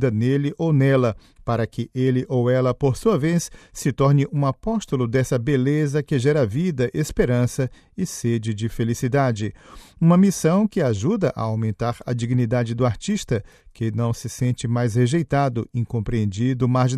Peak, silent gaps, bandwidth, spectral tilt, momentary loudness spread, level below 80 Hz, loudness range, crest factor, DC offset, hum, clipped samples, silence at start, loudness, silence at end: -4 dBFS; none; 14 kHz; -7 dB/octave; 8 LU; -44 dBFS; 3 LU; 16 dB; under 0.1%; none; under 0.1%; 0 s; -22 LUFS; 0 s